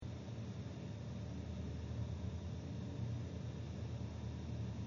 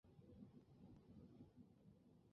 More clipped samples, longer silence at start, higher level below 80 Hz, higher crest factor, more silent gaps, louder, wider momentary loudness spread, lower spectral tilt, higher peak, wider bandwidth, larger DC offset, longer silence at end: neither; about the same, 0 s vs 0.05 s; first, -54 dBFS vs -80 dBFS; second, 12 dB vs 18 dB; neither; first, -46 LUFS vs -67 LUFS; about the same, 3 LU vs 3 LU; about the same, -8 dB/octave vs -9 dB/octave; first, -32 dBFS vs -48 dBFS; first, 7.4 kHz vs 5.4 kHz; neither; about the same, 0 s vs 0 s